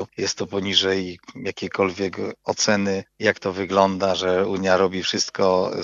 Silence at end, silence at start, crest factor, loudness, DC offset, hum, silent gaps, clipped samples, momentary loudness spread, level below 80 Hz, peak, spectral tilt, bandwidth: 0 s; 0 s; 20 dB; -22 LUFS; under 0.1%; none; none; under 0.1%; 8 LU; -64 dBFS; -2 dBFS; -3.5 dB/octave; 7.8 kHz